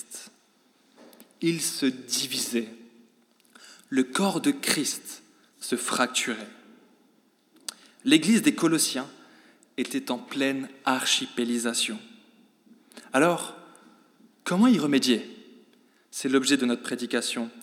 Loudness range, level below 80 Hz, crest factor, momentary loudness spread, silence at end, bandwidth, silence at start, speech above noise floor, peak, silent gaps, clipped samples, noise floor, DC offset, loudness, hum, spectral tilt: 4 LU; under -90 dBFS; 24 dB; 17 LU; 0 s; 17 kHz; 0.1 s; 38 dB; -4 dBFS; none; under 0.1%; -64 dBFS; under 0.1%; -25 LUFS; none; -3 dB/octave